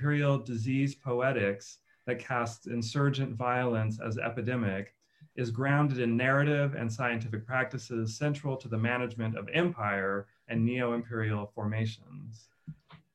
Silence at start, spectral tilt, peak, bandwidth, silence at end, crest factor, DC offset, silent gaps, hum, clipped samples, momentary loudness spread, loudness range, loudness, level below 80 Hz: 0 s; -7 dB/octave; -14 dBFS; 9.6 kHz; 0.2 s; 18 dB; under 0.1%; none; none; under 0.1%; 12 LU; 2 LU; -31 LUFS; -70 dBFS